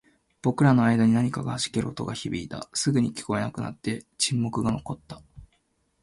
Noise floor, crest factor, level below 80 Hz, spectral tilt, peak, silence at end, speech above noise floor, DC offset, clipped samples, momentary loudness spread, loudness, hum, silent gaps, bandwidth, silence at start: -70 dBFS; 18 dB; -54 dBFS; -5.5 dB/octave; -8 dBFS; 0.6 s; 45 dB; under 0.1%; under 0.1%; 13 LU; -26 LUFS; none; none; 11.5 kHz; 0.45 s